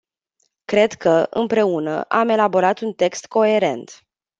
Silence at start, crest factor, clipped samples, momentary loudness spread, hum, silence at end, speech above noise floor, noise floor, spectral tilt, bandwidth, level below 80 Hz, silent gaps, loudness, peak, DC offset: 0.7 s; 18 dB; under 0.1%; 6 LU; none; 0.45 s; 51 dB; -69 dBFS; -5 dB/octave; 8 kHz; -64 dBFS; none; -18 LUFS; -2 dBFS; under 0.1%